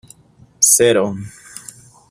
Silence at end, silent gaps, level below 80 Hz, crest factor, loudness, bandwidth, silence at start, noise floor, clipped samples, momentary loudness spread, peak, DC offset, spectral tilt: 0.5 s; none; -58 dBFS; 18 dB; -13 LUFS; 16 kHz; 0.6 s; -49 dBFS; under 0.1%; 24 LU; 0 dBFS; under 0.1%; -2.5 dB/octave